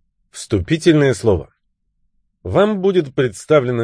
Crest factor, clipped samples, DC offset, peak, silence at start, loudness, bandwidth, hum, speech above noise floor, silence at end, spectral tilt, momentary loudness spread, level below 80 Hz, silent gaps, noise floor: 16 dB; under 0.1%; under 0.1%; -2 dBFS; 0.35 s; -16 LUFS; 10.5 kHz; none; 51 dB; 0 s; -6.5 dB/octave; 8 LU; -42 dBFS; none; -67 dBFS